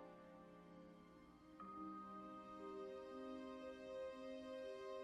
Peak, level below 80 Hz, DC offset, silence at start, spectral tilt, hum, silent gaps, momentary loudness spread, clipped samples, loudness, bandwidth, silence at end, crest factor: -42 dBFS; -80 dBFS; under 0.1%; 0 s; -6 dB/octave; none; none; 11 LU; under 0.1%; -55 LUFS; 12 kHz; 0 s; 12 dB